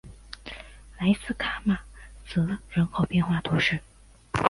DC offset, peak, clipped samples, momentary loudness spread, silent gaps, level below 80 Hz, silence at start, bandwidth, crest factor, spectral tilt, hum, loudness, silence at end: under 0.1%; -4 dBFS; under 0.1%; 18 LU; none; -46 dBFS; 0.05 s; 11.5 kHz; 24 dB; -6.5 dB/octave; none; -27 LUFS; 0 s